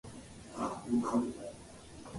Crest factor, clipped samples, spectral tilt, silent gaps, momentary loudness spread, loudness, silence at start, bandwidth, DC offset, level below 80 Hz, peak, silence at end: 18 dB; under 0.1%; -6 dB/octave; none; 19 LU; -36 LUFS; 0.05 s; 11.5 kHz; under 0.1%; -62 dBFS; -20 dBFS; 0 s